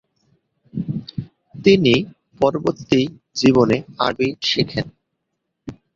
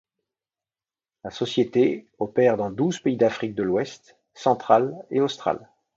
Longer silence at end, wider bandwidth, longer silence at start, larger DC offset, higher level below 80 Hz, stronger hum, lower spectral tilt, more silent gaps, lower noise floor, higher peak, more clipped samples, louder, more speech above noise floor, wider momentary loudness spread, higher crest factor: second, 0.25 s vs 0.4 s; about the same, 7.6 kHz vs 7.8 kHz; second, 0.75 s vs 1.25 s; neither; first, -50 dBFS vs -64 dBFS; neither; about the same, -6 dB/octave vs -6 dB/octave; neither; second, -76 dBFS vs under -90 dBFS; about the same, -2 dBFS vs -4 dBFS; neither; first, -19 LUFS vs -23 LUFS; second, 59 dB vs over 67 dB; first, 19 LU vs 10 LU; about the same, 20 dB vs 22 dB